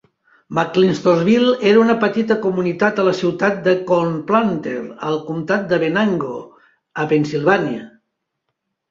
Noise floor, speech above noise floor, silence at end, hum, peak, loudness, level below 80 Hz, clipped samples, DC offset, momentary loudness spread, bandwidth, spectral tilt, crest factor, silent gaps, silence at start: -75 dBFS; 59 dB; 1 s; none; -2 dBFS; -17 LUFS; -60 dBFS; under 0.1%; under 0.1%; 11 LU; 7.6 kHz; -6.5 dB/octave; 16 dB; none; 0.5 s